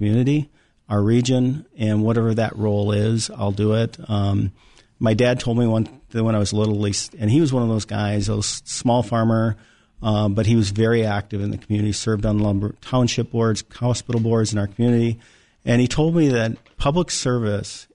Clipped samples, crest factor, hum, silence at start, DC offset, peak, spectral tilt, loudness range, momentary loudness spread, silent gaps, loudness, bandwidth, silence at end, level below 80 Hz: under 0.1%; 14 dB; none; 0 s; 0.3%; -6 dBFS; -6 dB/octave; 1 LU; 6 LU; none; -21 LUFS; 10.5 kHz; 0.1 s; -42 dBFS